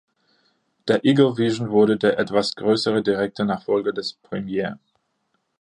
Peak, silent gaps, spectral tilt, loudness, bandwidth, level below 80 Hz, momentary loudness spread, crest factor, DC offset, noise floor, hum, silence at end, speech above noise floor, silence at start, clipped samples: -4 dBFS; none; -6 dB/octave; -21 LUFS; 10.5 kHz; -62 dBFS; 12 LU; 18 dB; under 0.1%; -72 dBFS; none; 0.85 s; 51 dB; 0.85 s; under 0.1%